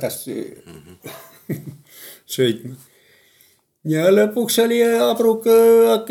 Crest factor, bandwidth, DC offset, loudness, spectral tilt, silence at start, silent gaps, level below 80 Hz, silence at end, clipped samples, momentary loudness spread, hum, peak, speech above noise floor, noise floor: 16 dB; 18 kHz; under 0.1%; -16 LUFS; -4.5 dB/octave; 0 s; none; -68 dBFS; 0 s; under 0.1%; 25 LU; none; -4 dBFS; 40 dB; -57 dBFS